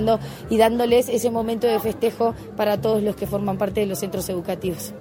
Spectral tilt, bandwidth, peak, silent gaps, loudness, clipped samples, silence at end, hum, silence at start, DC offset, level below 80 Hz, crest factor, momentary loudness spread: -5.5 dB/octave; 17 kHz; -4 dBFS; none; -22 LUFS; under 0.1%; 0 s; none; 0 s; under 0.1%; -46 dBFS; 18 dB; 8 LU